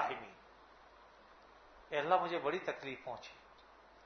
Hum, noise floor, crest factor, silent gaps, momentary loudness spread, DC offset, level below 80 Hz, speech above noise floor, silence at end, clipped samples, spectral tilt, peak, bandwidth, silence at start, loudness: none; -62 dBFS; 26 dB; none; 27 LU; under 0.1%; -74 dBFS; 24 dB; 0.05 s; under 0.1%; -2 dB/octave; -16 dBFS; 6.4 kHz; 0 s; -38 LUFS